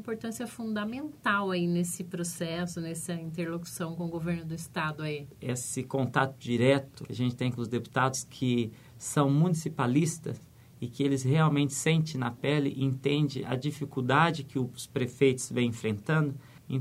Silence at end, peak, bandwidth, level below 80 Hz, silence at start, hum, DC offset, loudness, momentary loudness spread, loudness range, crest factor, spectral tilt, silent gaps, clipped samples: 0 s; -10 dBFS; 15.5 kHz; -64 dBFS; 0 s; none; under 0.1%; -30 LUFS; 11 LU; 6 LU; 20 dB; -5.5 dB/octave; none; under 0.1%